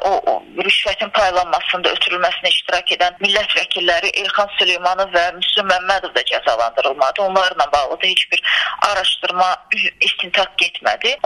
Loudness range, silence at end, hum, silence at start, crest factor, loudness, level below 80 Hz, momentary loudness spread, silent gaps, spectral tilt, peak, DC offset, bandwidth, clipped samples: 1 LU; 0.05 s; none; 0 s; 18 dB; -16 LUFS; -50 dBFS; 3 LU; none; -1 dB/octave; 0 dBFS; under 0.1%; 11.5 kHz; under 0.1%